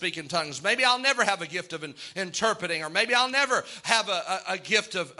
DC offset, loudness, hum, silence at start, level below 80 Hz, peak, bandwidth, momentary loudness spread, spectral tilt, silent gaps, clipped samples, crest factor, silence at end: under 0.1%; -25 LUFS; none; 0 s; -74 dBFS; -4 dBFS; 12 kHz; 11 LU; -1.5 dB/octave; none; under 0.1%; 24 dB; 0.05 s